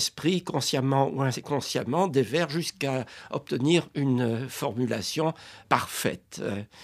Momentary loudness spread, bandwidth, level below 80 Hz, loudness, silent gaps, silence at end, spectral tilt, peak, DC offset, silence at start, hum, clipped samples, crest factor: 9 LU; 15.5 kHz; -66 dBFS; -27 LUFS; none; 0 s; -5 dB/octave; -4 dBFS; under 0.1%; 0 s; none; under 0.1%; 24 dB